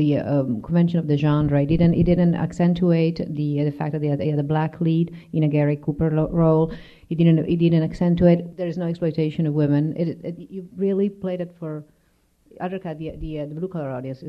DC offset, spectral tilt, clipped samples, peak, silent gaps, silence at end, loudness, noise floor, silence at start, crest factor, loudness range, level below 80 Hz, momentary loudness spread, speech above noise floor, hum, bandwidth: under 0.1%; -10 dB/octave; under 0.1%; -4 dBFS; none; 0 s; -21 LUFS; -62 dBFS; 0 s; 18 dB; 8 LU; -44 dBFS; 13 LU; 42 dB; none; 5.4 kHz